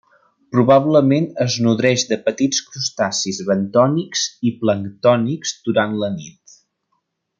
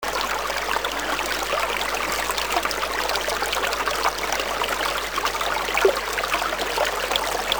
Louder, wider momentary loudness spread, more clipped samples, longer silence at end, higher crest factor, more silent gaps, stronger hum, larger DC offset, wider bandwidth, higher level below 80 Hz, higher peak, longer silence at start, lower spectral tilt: first, -18 LUFS vs -23 LUFS; first, 8 LU vs 3 LU; neither; first, 1.1 s vs 0 s; about the same, 16 dB vs 20 dB; neither; neither; second, under 0.1% vs 0.3%; second, 9.4 kHz vs over 20 kHz; second, -62 dBFS vs -44 dBFS; about the same, -2 dBFS vs -4 dBFS; first, 0.5 s vs 0 s; first, -4.5 dB/octave vs -1 dB/octave